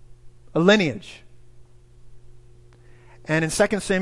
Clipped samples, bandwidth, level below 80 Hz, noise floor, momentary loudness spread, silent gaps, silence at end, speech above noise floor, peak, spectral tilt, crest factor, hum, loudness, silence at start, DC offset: under 0.1%; 12 kHz; -50 dBFS; -48 dBFS; 22 LU; none; 0 s; 28 dB; -2 dBFS; -5 dB/octave; 22 dB; none; -21 LUFS; 0.1 s; under 0.1%